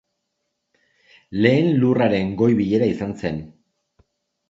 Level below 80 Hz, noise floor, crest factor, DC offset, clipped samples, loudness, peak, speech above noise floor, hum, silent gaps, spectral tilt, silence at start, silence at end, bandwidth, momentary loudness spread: -52 dBFS; -76 dBFS; 20 dB; under 0.1%; under 0.1%; -19 LUFS; -2 dBFS; 58 dB; none; none; -8.5 dB/octave; 1.3 s; 1 s; 7.6 kHz; 11 LU